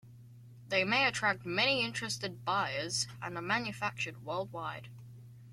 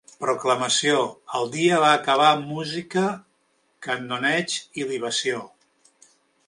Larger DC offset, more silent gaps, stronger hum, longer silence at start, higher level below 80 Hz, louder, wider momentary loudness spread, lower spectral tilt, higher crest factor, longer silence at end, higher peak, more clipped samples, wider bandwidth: neither; neither; neither; second, 0.05 s vs 0.2 s; about the same, -68 dBFS vs -72 dBFS; second, -33 LUFS vs -22 LUFS; first, 15 LU vs 11 LU; about the same, -3 dB/octave vs -3 dB/octave; about the same, 20 dB vs 20 dB; second, 0 s vs 1 s; second, -16 dBFS vs -4 dBFS; neither; first, 16 kHz vs 11.5 kHz